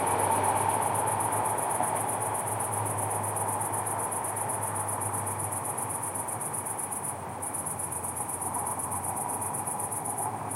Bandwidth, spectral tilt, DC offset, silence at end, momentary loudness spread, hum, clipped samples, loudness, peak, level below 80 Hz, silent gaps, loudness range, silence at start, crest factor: 16 kHz; -3.5 dB/octave; under 0.1%; 0 s; 5 LU; none; under 0.1%; -30 LUFS; -12 dBFS; -64 dBFS; none; 3 LU; 0 s; 18 dB